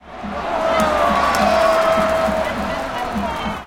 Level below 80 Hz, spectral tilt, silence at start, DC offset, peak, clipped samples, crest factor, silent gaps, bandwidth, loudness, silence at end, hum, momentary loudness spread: -38 dBFS; -4.5 dB/octave; 0.05 s; under 0.1%; -2 dBFS; under 0.1%; 16 dB; none; 17 kHz; -18 LUFS; 0 s; none; 8 LU